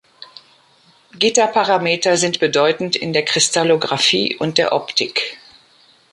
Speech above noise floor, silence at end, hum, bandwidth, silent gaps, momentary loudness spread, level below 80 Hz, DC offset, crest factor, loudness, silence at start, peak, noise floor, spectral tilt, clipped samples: 36 dB; 0.75 s; none; 11.5 kHz; none; 4 LU; -64 dBFS; under 0.1%; 18 dB; -16 LUFS; 0.2 s; 0 dBFS; -53 dBFS; -2.5 dB/octave; under 0.1%